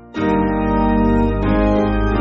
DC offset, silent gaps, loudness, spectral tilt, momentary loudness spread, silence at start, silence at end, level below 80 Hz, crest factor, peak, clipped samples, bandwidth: under 0.1%; none; -17 LUFS; -7 dB/octave; 2 LU; 0.05 s; 0 s; -24 dBFS; 12 dB; -4 dBFS; under 0.1%; 6.6 kHz